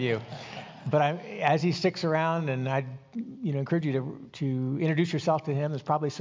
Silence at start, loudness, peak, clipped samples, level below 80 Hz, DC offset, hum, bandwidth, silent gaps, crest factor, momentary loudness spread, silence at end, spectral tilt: 0 s; -28 LUFS; -10 dBFS; under 0.1%; -70 dBFS; under 0.1%; none; 7.6 kHz; none; 18 dB; 12 LU; 0 s; -7 dB/octave